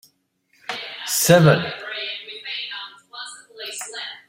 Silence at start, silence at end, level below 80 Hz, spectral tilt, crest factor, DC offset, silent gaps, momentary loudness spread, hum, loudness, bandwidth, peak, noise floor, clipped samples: 0.7 s; 0.1 s; -58 dBFS; -4 dB/octave; 22 dB; under 0.1%; none; 21 LU; none; -21 LUFS; 16.5 kHz; -2 dBFS; -65 dBFS; under 0.1%